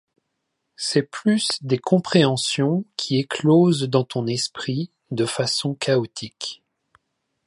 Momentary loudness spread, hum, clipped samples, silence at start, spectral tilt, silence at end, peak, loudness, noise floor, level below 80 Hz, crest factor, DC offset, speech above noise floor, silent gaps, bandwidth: 13 LU; none; under 0.1%; 0.8 s; -5 dB/octave; 0.9 s; -2 dBFS; -21 LUFS; -77 dBFS; -66 dBFS; 20 dB; under 0.1%; 56 dB; none; 11.5 kHz